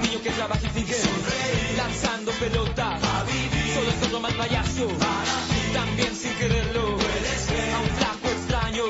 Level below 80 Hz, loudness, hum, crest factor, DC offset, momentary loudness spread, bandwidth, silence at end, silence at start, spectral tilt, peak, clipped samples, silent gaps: -36 dBFS; -25 LUFS; none; 18 dB; under 0.1%; 2 LU; 8 kHz; 0 s; 0 s; -4 dB/octave; -8 dBFS; under 0.1%; none